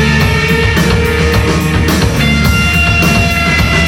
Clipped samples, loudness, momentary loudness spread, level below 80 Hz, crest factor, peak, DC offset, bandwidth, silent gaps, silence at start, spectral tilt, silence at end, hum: under 0.1%; -10 LUFS; 2 LU; -20 dBFS; 10 dB; 0 dBFS; under 0.1%; 17.5 kHz; none; 0 s; -5 dB/octave; 0 s; none